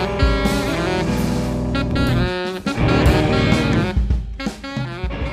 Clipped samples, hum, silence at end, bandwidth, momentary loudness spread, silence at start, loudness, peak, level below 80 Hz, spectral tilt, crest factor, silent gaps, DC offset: under 0.1%; none; 0 s; 15.5 kHz; 10 LU; 0 s; -19 LUFS; -4 dBFS; -24 dBFS; -6.5 dB/octave; 16 dB; none; under 0.1%